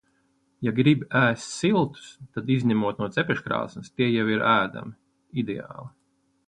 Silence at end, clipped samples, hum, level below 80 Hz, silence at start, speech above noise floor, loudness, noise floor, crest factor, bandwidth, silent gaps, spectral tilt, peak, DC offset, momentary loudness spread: 0.6 s; under 0.1%; none; -62 dBFS; 0.6 s; 45 dB; -25 LUFS; -69 dBFS; 20 dB; 10 kHz; none; -6 dB/octave; -6 dBFS; under 0.1%; 15 LU